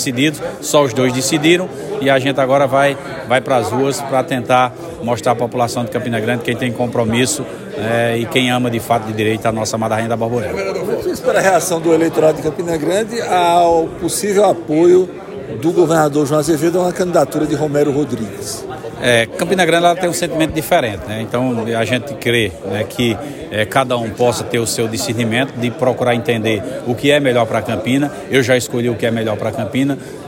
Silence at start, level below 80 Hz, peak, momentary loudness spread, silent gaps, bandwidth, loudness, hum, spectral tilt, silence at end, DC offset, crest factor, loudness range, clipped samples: 0 s; -48 dBFS; 0 dBFS; 7 LU; none; 16.5 kHz; -16 LUFS; none; -4.5 dB/octave; 0 s; under 0.1%; 16 dB; 3 LU; under 0.1%